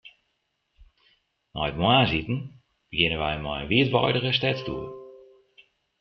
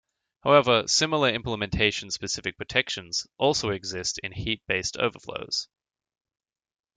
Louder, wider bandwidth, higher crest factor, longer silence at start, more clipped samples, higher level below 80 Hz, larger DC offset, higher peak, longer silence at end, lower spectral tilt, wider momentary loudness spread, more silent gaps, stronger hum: about the same, -24 LUFS vs -25 LUFS; second, 6.2 kHz vs 9.6 kHz; about the same, 24 dB vs 22 dB; second, 0.05 s vs 0.45 s; neither; about the same, -48 dBFS vs -50 dBFS; neither; about the same, -4 dBFS vs -6 dBFS; second, 0.85 s vs 1.35 s; first, -7.5 dB/octave vs -3 dB/octave; first, 17 LU vs 10 LU; neither; neither